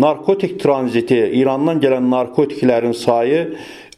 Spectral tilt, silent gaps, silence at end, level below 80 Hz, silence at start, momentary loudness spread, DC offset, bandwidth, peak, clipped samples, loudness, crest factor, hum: -7 dB/octave; none; 0.15 s; -60 dBFS; 0 s; 3 LU; under 0.1%; 12.5 kHz; 0 dBFS; under 0.1%; -16 LUFS; 16 dB; none